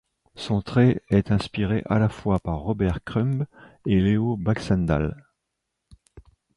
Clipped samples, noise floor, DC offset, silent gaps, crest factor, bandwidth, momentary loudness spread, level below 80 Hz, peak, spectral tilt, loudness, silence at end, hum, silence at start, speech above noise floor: under 0.1%; -80 dBFS; under 0.1%; none; 16 dB; 11 kHz; 8 LU; -40 dBFS; -8 dBFS; -8 dB/octave; -24 LUFS; 0.35 s; none; 0.35 s; 58 dB